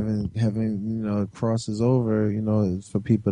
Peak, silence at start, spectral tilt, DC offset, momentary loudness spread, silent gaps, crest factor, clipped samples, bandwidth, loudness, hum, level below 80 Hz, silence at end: -8 dBFS; 0 s; -8.5 dB/octave; under 0.1%; 5 LU; none; 16 dB; under 0.1%; 10 kHz; -25 LUFS; none; -52 dBFS; 0 s